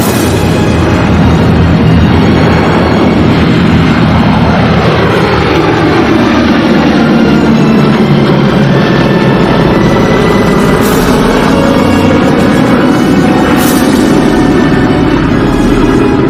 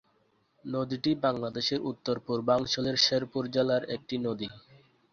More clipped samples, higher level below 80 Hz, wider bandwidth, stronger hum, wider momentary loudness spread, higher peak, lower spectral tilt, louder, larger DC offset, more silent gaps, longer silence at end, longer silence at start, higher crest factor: first, 5% vs under 0.1%; first, -22 dBFS vs -64 dBFS; first, 16 kHz vs 7.2 kHz; neither; second, 1 LU vs 10 LU; first, 0 dBFS vs -12 dBFS; first, -6.5 dB/octave vs -4.5 dB/octave; first, -7 LUFS vs -29 LUFS; neither; neither; second, 0 s vs 0.55 s; second, 0 s vs 0.65 s; second, 6 dB vs 18 dB